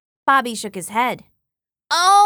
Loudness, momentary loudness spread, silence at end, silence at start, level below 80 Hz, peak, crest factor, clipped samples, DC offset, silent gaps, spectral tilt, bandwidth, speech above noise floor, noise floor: -19 LUFS; 11 LU; 0 s; 0.25 s; -66 dBFS; -4 dBFS; 16 dB; under 0.1%; under 0.1%; none; -1.5 dB/octave; 19.5 kHz; 66 dB; -83 dBFS